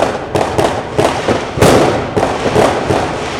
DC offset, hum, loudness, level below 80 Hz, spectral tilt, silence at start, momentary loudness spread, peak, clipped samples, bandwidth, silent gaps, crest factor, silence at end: under 0.1%; none; -13 LUFS; -32 dBFS; -5 dB/octave; 0 s; 6 LU; 0 dBFS; 0.1%; 18.5 kHz; none; 12 dB; 0 s